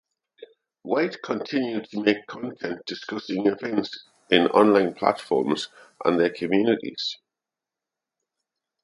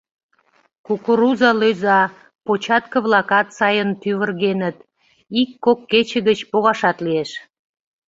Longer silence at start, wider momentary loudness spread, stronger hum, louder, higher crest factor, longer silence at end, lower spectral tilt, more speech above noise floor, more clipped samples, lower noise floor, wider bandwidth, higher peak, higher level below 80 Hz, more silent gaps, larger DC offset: second, 0.4 s vs 0.9 s; first, 14 LU vs 9 LU; neither; second, -24 LUFS vs -18 LUFS; about the same, 22 dB vs 18 dB; first, 1.7 s vs 0.65 s; about the same, -5.5 dB/octave vs -5.5 dB/octave; first, 64 dB vs 43 dB; neither; first, -88 dBFS vs -60 dBFS; first, 11.5 kHz vs 7.8 kHz; about the same, -2 dBFS vs -2 dBFS; second, -70 dBFS vs -64 dBFS; second, none vs 2.35-2.39 s; neither